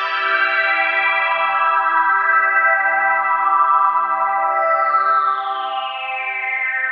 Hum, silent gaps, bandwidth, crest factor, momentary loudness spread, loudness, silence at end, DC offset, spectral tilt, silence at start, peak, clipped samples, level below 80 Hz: none; none; 5.6 kHz; 14 dB; 7 LU; -16 LUFS; 0 s; under 0.1%; -2.5 dB/octave; 0 s; -4 dBFS; under 0.1%; under -90 dBFS